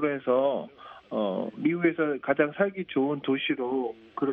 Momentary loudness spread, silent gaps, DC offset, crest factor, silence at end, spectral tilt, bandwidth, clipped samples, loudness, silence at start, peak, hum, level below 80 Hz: 9 LU; none; under 0.1%; 20 dB; 0 s; -9 dB/octave; 4.2 kHz; under 0.1%; -28 LUFS; 0 s; -8 dBFS; none; -72 dBFS